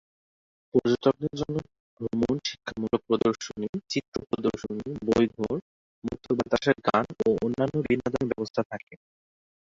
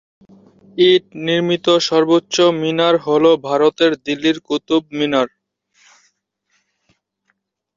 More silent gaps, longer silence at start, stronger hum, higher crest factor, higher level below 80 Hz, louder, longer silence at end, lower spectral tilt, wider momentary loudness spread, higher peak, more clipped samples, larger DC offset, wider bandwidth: first, 1.80-1.97 s, 3.69-3.73 s, 4.08-4.12 s, 5.62-6.02 s, 8.50-8.54 s, 8.65-8.70 s, 8.83-8.87 s vs none; about the same, 0.75 s vs 0.75 s; neither; about the same, 20 dB vs 16 dB; first, -56 dBFS vs -62 dBFS; second, -28 LUFS vs -16 LUFS; second, 0.65 s vs 2.5 s; first, -6 dB/octave vs -4.5 dB/octave; first, 10 LU vs 6 LU; second, -8 dBFS vs -2 dBFS; neither; neither; about the same, 7.8 kHz vs 7.6 kHz